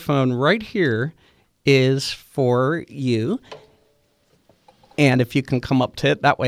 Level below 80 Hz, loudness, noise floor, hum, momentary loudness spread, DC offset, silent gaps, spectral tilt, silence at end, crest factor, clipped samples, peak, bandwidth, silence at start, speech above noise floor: -54 dBFS; -20 LUFS; -62 dBFS; none; 9 LU; under 0.1%; none; -6.5 dB/octave; 0 s; 18 dB; under 0.1%; -4 dBFS; 15 kHz; 0 s; 43 dB